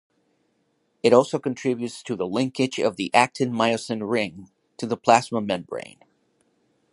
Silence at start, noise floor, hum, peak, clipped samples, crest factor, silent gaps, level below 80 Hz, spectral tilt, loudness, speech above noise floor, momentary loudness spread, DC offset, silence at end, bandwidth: 1.05 s; -69 dBFS; none; -2 dBFS; under 0.1%; 24 dB; none; -66 dBFS; -5 dB/octave; -23 LUFS; 47 dB; 12 LU; under 0.1%; 1.1 s; 11.5 kHz